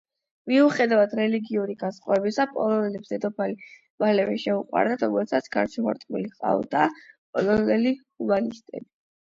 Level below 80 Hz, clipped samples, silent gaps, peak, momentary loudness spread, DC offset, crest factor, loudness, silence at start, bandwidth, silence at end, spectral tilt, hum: -64 dBFS; under 0.1%; 3.90-3.98 s, 7.18-7.33 s; -6 dBFS; 11 LU; under 0.1%; 18 dB; -24 LUFS; 0.45 s; 7.6 kHz; 0.4 s; -6.5 dB/octave; none